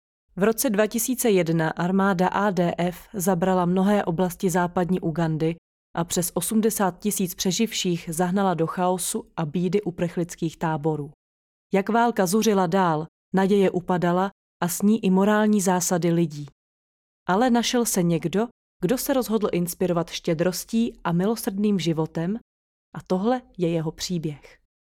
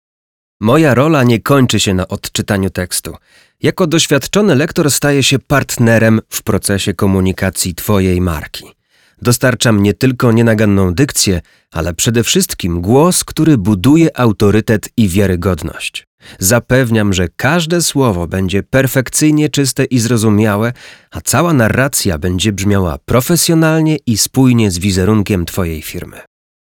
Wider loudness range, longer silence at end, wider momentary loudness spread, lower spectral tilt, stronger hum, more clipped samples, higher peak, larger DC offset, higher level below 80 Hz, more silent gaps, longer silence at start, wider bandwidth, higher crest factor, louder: about the same, 4 LU vs 2 LU; about the same, 0.5 s vs 0.45 s; about the same, 8 LU vs 9 LU; about the same, -5 dB/octave vs -5 dB/octave; neither; neither; second, -8 dBFS vs 0 dBFS; neither; second, -56 dBFS vs -36 dBFS; first, 5.58-5.94 s, 11.14-11.70 s, 13.08-13.32 s, 14.32-14.60 s, 16.52-17.26 s, 18.51-18.80 s, 22.41-22.92 s vs 16.07-16.18 s; second, 0.35 s vs 0.6 s; second, 18 kHz vs 20 kHz; about the same, 16 dB vs 12 dB; second, -23 LUFS vs -12 LUFS